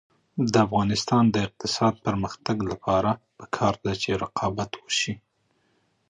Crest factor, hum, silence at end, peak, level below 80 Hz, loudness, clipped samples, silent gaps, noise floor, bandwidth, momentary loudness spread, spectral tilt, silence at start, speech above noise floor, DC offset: 20 dB; none; 0.95 s; -6 dBFS; -50 dBFS; -25 LUFS; under 0.1%; none; -69 dBFS; 10.5 kHz; 9 LU; -5 dB/octave; 0.35 s; 45 dB; under 0.1%